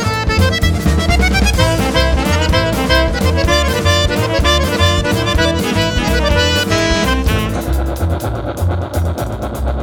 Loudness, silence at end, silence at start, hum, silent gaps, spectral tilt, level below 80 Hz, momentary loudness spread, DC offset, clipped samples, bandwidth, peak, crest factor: -14 LUFS; 0 s; 0 s; none; none; -4.5 dB/octave; -20 dBFS; 6 LU; under 0.1%; under 0.1%; 19 kHz; 0 dBFS; 14 dB